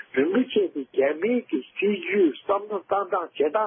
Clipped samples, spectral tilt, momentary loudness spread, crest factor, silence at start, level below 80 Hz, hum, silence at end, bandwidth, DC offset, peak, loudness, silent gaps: under 0.1%; -10 dB/octave; 5 LU; 14 dB; 0.15 s; -74 dBFS; none; 0 s; 3.6 kHz; under 0.1%; -10 dBFS; -25 LUFS; none